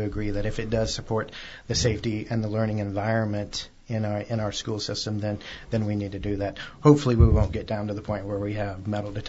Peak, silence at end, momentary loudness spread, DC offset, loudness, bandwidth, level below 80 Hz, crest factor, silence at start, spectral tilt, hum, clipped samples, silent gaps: -4 dBFS; 0 s; 11 LU; under 0.1%; -26 LUFS; 8 kHz; -36 dBFS; 22 dB; 0 s; -6 dB/octave; none; under 0.1%; none